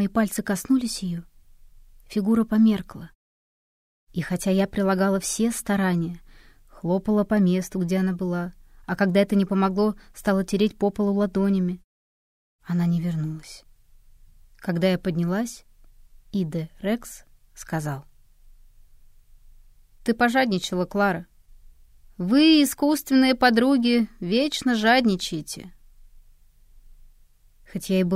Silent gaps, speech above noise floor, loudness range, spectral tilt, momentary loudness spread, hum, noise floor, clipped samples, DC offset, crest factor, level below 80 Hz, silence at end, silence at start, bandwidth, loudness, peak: 3.15-4.07 s, 11.84-12.59 s; 32 dB; 10 LU; -5.5 dB/octave; 15 LU; none; -55 dBFS; under 0.1%; under 0.1%; 20 dB; -50 dBFS; 0 s; 0 s; 16 kHz; -23 LUFS; -4 dBFS